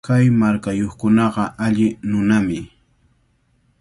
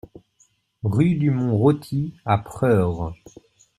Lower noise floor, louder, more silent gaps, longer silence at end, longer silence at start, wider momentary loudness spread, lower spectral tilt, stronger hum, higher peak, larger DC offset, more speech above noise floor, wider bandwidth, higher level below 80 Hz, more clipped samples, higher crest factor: about the same, -61 dBFS vs -62 dBFS; first, -18 LUFS vs -22 LUFS; neither; first, 1.15 s vs 0.65 s; second, 0.05 s vs 0.85 s; second, 7 LU vs 10 LU; second, -7.5 dB/octave vs -9 dB/octave; neither; about the same, -4 dBFS vs -4 dBFS; neither; about the same, 44 dB vs 42 dB; second, 11.5 kHz vs 13 kHz; about the same, -46 dBFS vs -50 dBFS; neither; about the same, 14 dB vs 18 dB